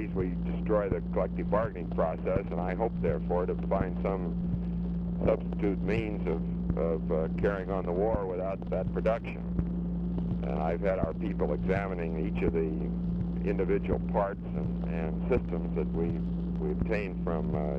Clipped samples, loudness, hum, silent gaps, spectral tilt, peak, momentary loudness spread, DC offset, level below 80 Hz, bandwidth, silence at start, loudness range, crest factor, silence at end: under 0.1%; -31 LUFS; none; none; -10.5 dB/octave; -14 dBFS; 4 LU; under 0.1%; -38 dBFS; 4.8 kHz; 0 s; 1 LU; 16 dB; 0 s